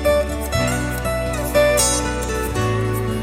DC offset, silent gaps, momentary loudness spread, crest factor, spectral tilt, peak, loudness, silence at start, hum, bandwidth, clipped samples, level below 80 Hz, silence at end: under 0.1%; none; 7 LU; 16 dB; -4 dB/octave; -4 dBFS; -19 LUFS; 0 s; none; 16.5 kHz; under 0.1%; -28 dBFS; 0 s